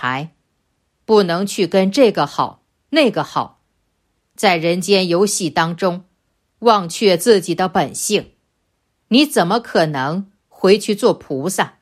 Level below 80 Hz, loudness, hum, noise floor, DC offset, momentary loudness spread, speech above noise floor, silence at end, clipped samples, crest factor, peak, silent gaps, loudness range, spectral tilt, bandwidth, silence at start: -60 dBFS; -16 LUFS; none; -68 dBFS; under 0.1%; 9 LU; 52 dB; 0.15 s; under 0.1%; 16 dB; 0 dBFS; none; 2 LU; -4.5 dB/octave; 15 kHz; 0 s